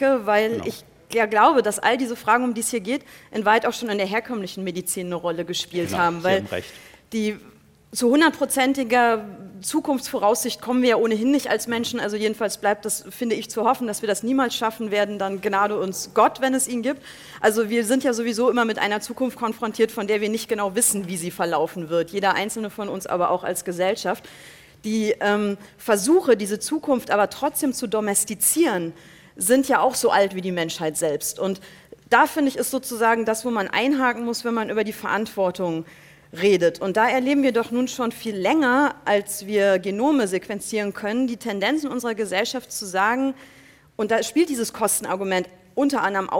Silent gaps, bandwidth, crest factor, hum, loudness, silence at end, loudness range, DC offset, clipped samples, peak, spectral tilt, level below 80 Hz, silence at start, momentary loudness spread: none; 17 kHz; 20 dB; none; -22 LUFS; 0 s; 3 LU; under 0.1%; under 0.1%; -2 dBFS; -3.5 dB/octave; -62 dBFS; 0 s; 9 LU